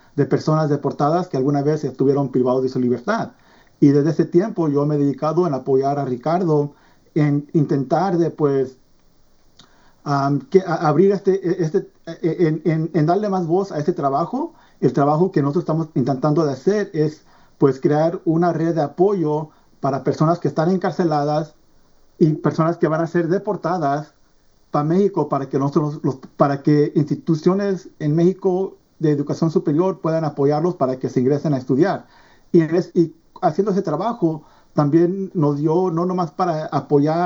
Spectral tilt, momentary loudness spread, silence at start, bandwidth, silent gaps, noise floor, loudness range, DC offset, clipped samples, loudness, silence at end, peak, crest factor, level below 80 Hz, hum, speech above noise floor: -8.5 dB/octave; 6 LU; 0.15 s; 7.2 kHz; none; -55 dBFS; 2 LU; under 0.1%; under 0.1%; -19 LUFS; 0 s; 0 dBFS; 18 dB; -60 dBFS; none; 36 dB